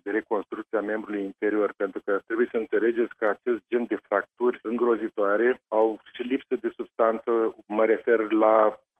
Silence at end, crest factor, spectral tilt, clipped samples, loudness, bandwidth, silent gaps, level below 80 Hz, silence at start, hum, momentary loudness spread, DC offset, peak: 0.25 s; 18 dB; -7.5 dB/octave; under 0.1%; -26 LUFS; 3.8 kHz; none; -74 dBFS; 0.05 s; none; 8 LU; under 0.1%; -8 dBFS